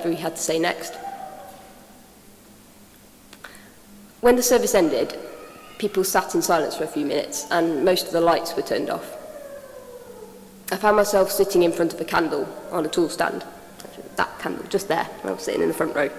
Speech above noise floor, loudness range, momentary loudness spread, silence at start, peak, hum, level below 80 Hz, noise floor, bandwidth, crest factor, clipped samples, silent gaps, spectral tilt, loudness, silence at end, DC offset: 27 dB; 6 LU; 22 LU; 0 s; -2 dBFS; none; -56 dBFS; -49 dBFS; 16 kHz; 22 dB; under 0.1%; none; -3.5 dB/octave; -22 LUFS; 0 s; under 0.1%